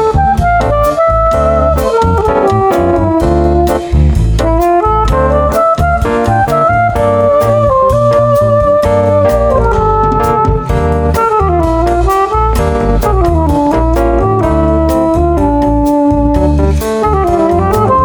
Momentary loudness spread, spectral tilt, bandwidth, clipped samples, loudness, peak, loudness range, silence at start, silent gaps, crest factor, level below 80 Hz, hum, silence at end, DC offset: 2 LU; -7.5 dB/octave; over 20 kHz; under 0.1%; -10 LUFS; 0 dBFS; 2 LU; 0 s; none; 10 dB; -16 dBFS; none; 0 s; under 0.1%